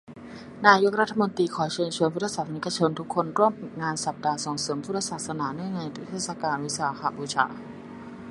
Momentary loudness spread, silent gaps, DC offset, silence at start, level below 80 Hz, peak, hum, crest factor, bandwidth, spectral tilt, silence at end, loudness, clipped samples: 13 LU; none; under 0.1%; 0.1 s; -66 dBFS; -2 dBFS; none; 26 dB; 11.5 kHz; -4 dB/octave; 0 s; -26 LUFS; under 0.1%